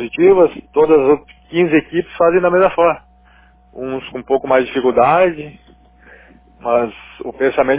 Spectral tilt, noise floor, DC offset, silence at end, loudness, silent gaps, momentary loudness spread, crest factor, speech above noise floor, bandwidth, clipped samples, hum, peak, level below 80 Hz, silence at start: -10 dB/octave; -48 dBFS; under 0.1%; 0 s; -15 LUFS; none; 15 LU; 14 dB; 34 dB; 4 kHz; under 0.1%; none; 0 dBFS; -48 dBFS; 0 s